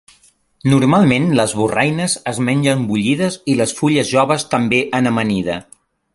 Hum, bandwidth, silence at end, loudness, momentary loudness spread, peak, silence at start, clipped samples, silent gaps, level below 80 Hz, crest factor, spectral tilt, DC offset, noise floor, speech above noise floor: none; 11.5 kHz; 0.5 s; -16 LUFS; 6 LU; -2 dBFS; 0.65 s; under 0.1%; none; -50 dBFS; 16 dB; -5 dB/octave; under 0.1%; -53 dBFS; 38 dB